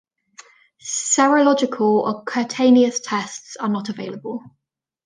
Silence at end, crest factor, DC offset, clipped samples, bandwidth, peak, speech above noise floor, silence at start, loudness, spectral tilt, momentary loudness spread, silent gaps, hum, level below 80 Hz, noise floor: 0.6 s; 18 dB; under 0.1%; under 0.1%; 10 kHz; -2 dBFS; 29 dB; 0.85 s; -19 LUFS; -3.5 dB/octave; 16 LU; none; none; -72 dBFS; -48 dBFS